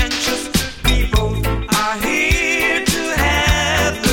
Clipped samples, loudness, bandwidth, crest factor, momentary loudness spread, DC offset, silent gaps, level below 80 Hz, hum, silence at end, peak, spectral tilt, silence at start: under 0.1%; -16 LUFS; 19.5 kHz; 16 dB; 4 LU; under 0.1%; none; -22 dBFS; none; 0 s; 0 dBFS; -3.5 dB/octave; 0 s